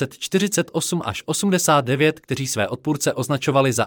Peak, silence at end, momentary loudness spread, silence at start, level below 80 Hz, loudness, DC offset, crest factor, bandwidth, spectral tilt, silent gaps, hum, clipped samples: -4 dBFS; 0 s; 7 LU; 0 s; -60 dBFS; -21 LUFS; under 0.1%; 16 dB; 19 kHz; -4.5 dB/octave; none; none; under 0.1%